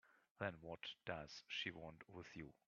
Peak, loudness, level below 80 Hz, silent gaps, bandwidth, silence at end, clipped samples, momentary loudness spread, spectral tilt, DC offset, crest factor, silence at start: -28 dBFS; -51 LUFS; -76 dBFS; 0.31-0.36 s; 7.2 kHz; 0.15 s; under 0.1%; 10 LU; -2.5 dB/octave; under 0.1%; 24 dB; 0.05 s